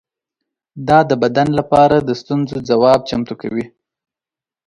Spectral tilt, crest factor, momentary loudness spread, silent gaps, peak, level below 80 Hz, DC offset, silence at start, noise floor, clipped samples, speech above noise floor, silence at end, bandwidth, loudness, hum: -7 dB/octave; 16 dB; 12 LU; none; 0 dBFS; -48 dBFS; under 0.1%; 0.75 s; -89 dBFS; under 0.1%; 75 dB; 1 s; 11.5 kHz; -15 LUFS; none